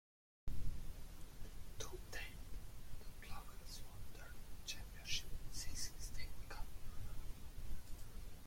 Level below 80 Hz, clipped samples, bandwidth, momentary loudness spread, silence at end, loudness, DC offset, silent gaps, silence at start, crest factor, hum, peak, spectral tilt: -50 dBFS; under 0.1%; 16.5 kHz; 11 LU; 0 s; -52 LUFS; under 0.1%; none; 0.45 s; 16 dB; none; -26 dBFS; -2.5 dB/octave